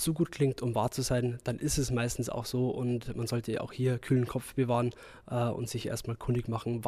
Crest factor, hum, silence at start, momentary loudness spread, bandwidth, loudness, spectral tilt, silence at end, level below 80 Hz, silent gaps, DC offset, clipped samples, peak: 16 dB; none; 0 s; 6 LU; 15.5 kHz; -32 LUFS; -6 dB/octave; 0 s; -50 dBFS; none; under 0.1%; under 0.1%; -16 dBFS